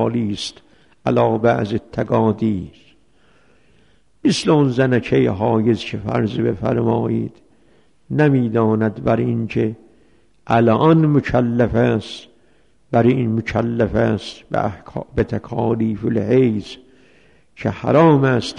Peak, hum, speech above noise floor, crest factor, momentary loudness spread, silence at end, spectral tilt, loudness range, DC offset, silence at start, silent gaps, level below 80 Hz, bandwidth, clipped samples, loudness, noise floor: -2 dBFS; none; 41 dB; 16 dB; 11 LU; 0 s; -7.5 dB/octave; 3 LU; 0.2%; 0 s; none; -44 dBFS; 10.5 kHz; under 0.1%; -18 LUFS; -58 dBFS